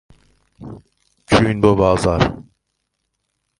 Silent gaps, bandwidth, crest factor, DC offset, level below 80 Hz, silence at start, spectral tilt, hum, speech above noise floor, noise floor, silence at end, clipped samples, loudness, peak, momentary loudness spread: none; 11.5 kHz; 20 dB; under 0.1%; -36 dBFS; 0.6 s; -6.5 dB/octave; none; 57 dB; -73 dBFS; 1.15 s; under 0.1%; -16 LUFS; 0 dBFS; 23 LU